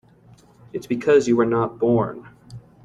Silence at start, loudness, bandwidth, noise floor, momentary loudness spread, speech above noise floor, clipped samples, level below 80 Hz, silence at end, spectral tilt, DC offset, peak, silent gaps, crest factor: 0.75 s; -20 LUFS; 12 kHz; -51 dBFS; 18 LU; 32 dB; under 0.1%; -56 dBFS; 0.25 s; -7 dB/octave; under 0.1%; -6 dBFS; none; 16 dB